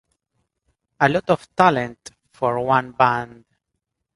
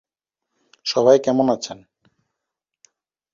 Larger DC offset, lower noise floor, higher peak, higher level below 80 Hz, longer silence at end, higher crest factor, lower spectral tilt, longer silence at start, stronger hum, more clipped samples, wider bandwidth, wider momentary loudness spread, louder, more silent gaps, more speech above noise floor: neither; second, -79 dBFS vs -83 dBFS; about the same, 0 dBFS vs -2 dBFS; first, -56 dBFS vs -66 dBFS; second, 0.9 s vs 1.6 s; about the same, 22 dB vs 20 dB; about the same, -6 dB/octave vs -5 dB/octave; first, 1 s vs 0.85 s; neither; neither; first, 11.5 kHz vs 7.6 kHz; second, 9 LU vs 17 LU; about the same, -20 LUFS vs -18 LUFS; neither; second, 59 dB vs 66 dB